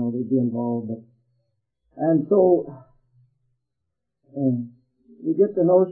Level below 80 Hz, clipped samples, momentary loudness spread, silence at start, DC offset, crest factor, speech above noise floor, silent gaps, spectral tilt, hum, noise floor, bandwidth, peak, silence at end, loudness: -70 dBFS; under 0.1%; 18 LU; 0 s; under 0.1%; 18 dB; 61 dB; none; -15 dB/octave; none; -81 dBFS; 1.8 kHz; -6 dBFS; 0 s; -22 LUFS